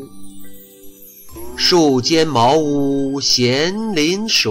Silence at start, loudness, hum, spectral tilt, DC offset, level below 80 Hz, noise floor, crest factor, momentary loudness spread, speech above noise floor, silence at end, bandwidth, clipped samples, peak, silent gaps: 0 s; -15 LUFS; none; -3.5 dB/octave; under 0.1%; -46 dBFS; -39 dBFS; 12 dB; 5 LU; 24 dB; 0 s; 16 kHz; under 0.1%; -4 dBFS; none